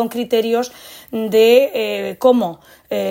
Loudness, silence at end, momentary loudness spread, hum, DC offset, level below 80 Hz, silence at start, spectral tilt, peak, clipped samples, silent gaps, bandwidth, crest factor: -16 LUFS; 0 s; 15 LU; none; under 0.1%; -62 dBFS; 0 s; -4.5 dB/octave; -2 dBFS; under 0.1%; none; 16.5 kHz; 16 dB